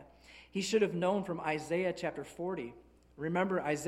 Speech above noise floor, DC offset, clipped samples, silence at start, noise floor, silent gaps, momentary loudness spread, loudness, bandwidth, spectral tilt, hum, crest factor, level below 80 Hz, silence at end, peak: 24 dB; under 0.1%; under 0.1%; 0 s; -58 dBFS; none; 11 LU; -35 LUFS; 14.5 kHz; -5 dB/octave; none; 18 dB; -66 dBFS; 0 s; -18 dBFS